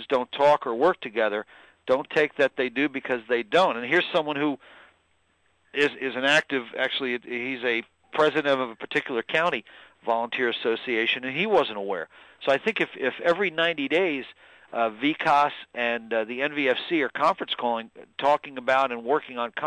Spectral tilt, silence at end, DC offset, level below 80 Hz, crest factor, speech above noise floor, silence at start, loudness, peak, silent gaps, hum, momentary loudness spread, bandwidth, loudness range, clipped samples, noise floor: -4.5 dB/octave; 0 s; under 0.1%; -72 dBFS; 16 dB; 43 dB; 0 s; -25 LUFS; -10 dBFS; none; none; 9 LU; 10.5 kHz; 2 LU; under 0.1%; -68 dBFS